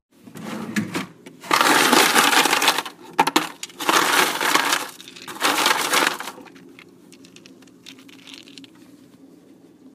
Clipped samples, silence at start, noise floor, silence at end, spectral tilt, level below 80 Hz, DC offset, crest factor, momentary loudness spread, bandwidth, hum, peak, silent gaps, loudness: under 0.1%; 0.25 s; -49 dBFS; 1.3 s; -1 dB/octave; -72 dBFS; under 0.1%; 22 dB; 23 LU; 15.5 kHz; none; 0 dBFS; none; -18 LUFS